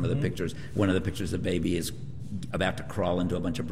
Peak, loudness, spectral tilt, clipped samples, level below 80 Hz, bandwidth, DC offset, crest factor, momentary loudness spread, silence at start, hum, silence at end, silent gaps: -12 dBFS; -30 LUFS; -6 dB/octave; under 0.1%; -48 dBFS; 15.5 kHz; 1%; 16 dB; 9 LU; 0 s; none; 0 s; none